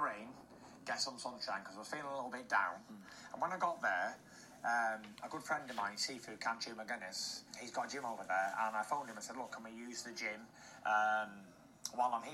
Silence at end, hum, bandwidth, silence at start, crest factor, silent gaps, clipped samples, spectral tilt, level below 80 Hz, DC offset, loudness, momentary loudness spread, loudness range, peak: 0 s; none; 16 kHz; 0 s; 20 dB; none; under 0.1%; -2 dB/octave; -80 dBFS; under 0.1%; -40 LUFS; 15 LU; 2 LU; -20 dBFS